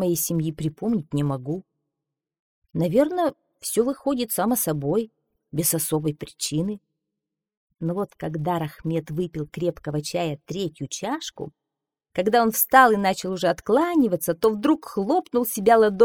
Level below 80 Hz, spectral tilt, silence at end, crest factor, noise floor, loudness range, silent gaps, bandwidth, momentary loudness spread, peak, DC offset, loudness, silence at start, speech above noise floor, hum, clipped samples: -56 dBFS; -5 dB/octave; 0 s; 22 dB; -86 dBFS; 9 LU; 2.39-2.62 s, 7.57-7.67 s; 20 kHz; 12 LU; -2 dBFS; under 0.1%; -23 LUFS; 0 s; 63 dB; none; under 0.1%